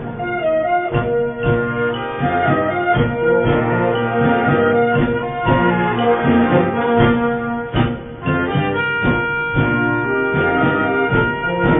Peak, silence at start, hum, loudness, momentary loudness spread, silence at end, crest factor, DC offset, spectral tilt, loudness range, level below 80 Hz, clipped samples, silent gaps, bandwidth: 0 dBFS; 0 s; none; -17 LUFS; 5 LU; 0 s; 16 dB; under 0.1%; -11.5 dB/octave; 2 LU; -36 dBFS; under 0.1%; none; 3.9 kHz